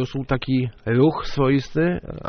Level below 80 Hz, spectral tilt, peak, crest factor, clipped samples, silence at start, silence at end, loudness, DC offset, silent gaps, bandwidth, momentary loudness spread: -40 dBFS; -6.5 dB/octave; -6 dBFS; 16 dB; under 0.1%; 0 s; 0 s; -21 LUFS; under 0.1%; none; 6.6 kHz; 5 LU